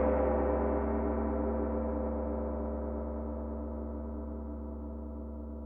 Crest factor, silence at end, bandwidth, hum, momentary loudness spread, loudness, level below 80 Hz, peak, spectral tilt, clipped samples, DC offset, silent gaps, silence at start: 14 dB; 0 s; 2.8 kHz; none; 12 LU; -35 LUFS; -40 dBFS; -18 dBFS; -12.5 dB/octave; under 0.1%; under 0.1%; none; 0 s